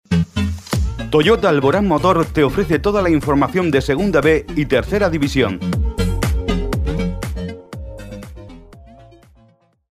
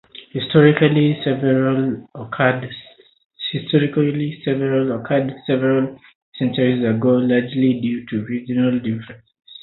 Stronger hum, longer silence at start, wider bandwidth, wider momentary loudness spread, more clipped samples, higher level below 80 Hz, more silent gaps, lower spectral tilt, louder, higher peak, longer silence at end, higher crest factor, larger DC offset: neither; about the same, 0.1 s vs 0.15 s; first, 15.5 kHz vs 4.1 kHz; first, 17 LU vs 12 LU; neither; first, -28 dBFS vs -58 dBFS; second, none vs 3.25-3.30 s, 6.15-6.32 s; second, -6.5 dB/octave vs -12 dB/octave; about the same, -17 LUFS vs -19 LUFS; about the same, -2 dBFS vs 0 dBFS; first, 1 s vs 0.1 s; about the same, 16 dB vs 18 dB; neither